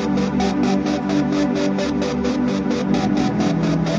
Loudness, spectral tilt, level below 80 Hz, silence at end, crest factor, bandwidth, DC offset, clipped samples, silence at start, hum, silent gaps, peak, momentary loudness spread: -20 LUFS; -6.5 dB/octave; -42 dBFS; 0 s; 12 dB; 7.8 kHz; under 0.1%; under 0.1%; 0 s; none; none; -8 dBFS; 2 LU